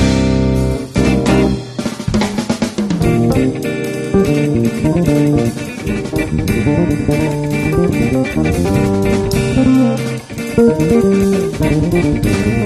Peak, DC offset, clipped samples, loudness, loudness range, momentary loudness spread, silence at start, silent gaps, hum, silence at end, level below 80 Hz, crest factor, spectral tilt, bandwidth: 0 dBFS; under 0.1%; under 0.1%; -15 LUFS; 2 LU; 7 LU; 0 s; none; none; 0 s; -28 dBFS; 14 dB; -7 dB/octave; 13.5 kHz